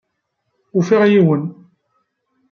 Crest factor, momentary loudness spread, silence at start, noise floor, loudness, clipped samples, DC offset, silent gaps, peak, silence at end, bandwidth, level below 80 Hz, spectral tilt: 16 dB; 11 LU; 0.75 s; -72 dBFS; -15 LUFS; under 0.1%; under 0.1%; none; -2 dBFS; 1 s; 7 kHz; -66 dBFS; -8 dB/octave